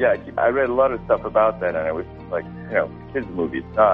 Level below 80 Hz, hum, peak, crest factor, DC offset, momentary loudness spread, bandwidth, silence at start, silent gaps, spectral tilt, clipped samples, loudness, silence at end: -46 dBFS; none; -4 dBFS; 16 dB; under 0.1%; 10 LU; 4.6 kHz; 0 s; none; -9.5 dB/octave; under 0.1%; -22 LUFS; 0 s